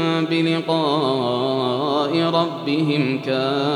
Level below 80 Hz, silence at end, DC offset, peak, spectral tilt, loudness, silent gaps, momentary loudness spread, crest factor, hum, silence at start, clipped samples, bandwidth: -78 dBFS; 0 s; under 0.1%; -6 dBFS; -6.5 dB/octave; -20 LUFS; none; 2 LU; 14 dB; none; 0 s; under 0.1%; 11.5 kHz